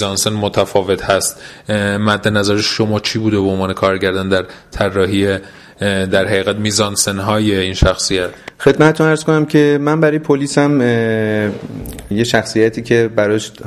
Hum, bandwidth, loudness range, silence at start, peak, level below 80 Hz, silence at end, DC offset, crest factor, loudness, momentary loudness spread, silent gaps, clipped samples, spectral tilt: none; 15 kHz; 3 LU; 0 s; 0 dBFS; -34 dBFS; 0 s; under 0.1%; 14 dB; -15 LUFS; 7 LU; none; under 0.1%; -4.5 dB/octave